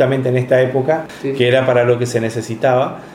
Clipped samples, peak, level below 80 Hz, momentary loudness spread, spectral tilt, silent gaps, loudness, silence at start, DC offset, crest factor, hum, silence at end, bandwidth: under 0.1%; 0 dBFS; -56 dBFS; 6 LU; -6.5 dB/octave; none; -16 LUFS; 0 s; under 0.1%; 14 dB; none; 0 s; 14 kHz